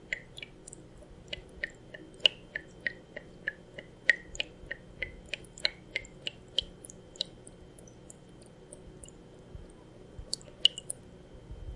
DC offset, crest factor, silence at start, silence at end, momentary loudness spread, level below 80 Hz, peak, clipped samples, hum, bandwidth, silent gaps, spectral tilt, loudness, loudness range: under 0.1%; 34 dB; 0 s; 0 s; 25 LU; -56 dBFS; -4 dBFS; under 0.1%; none; 11.5 kHz; none; -1.5 dB/octave; -34 LUFS; 13 LU